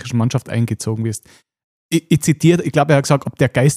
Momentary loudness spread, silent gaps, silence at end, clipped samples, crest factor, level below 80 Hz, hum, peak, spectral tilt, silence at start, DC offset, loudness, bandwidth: 8 LU; 1.64-1.89 s; 0 s; under 0.1%; 14 dB; -50 dBFS; none; -2 dBFS; -6 dB/octave; 0 s; under 0.1%; -17 LUFS; 15.5 kHz